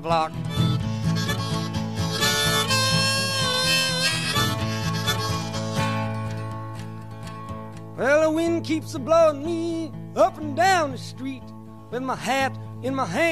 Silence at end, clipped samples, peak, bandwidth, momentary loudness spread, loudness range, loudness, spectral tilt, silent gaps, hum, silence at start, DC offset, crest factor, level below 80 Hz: 0 s; under 0.1%; -6 dBFS; 15 kHz; 16 LU; 5 LU; -23 LUFS; -4 dB/octave; none; none; 0 s; 0.5%; 18 dB; -48 dBFS